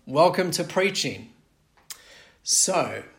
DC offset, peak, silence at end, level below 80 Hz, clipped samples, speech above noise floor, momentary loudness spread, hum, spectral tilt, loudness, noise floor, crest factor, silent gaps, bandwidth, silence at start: under 0.1%; -6 dBFS; 0.1 s; -66 dBFS; under 0.1%; 39 dB; 22 LU; none; -2.5 dB/octave; -22 LUFS; -62 dBFS; 18 dB; none; 16.5 kHz; 0.05 s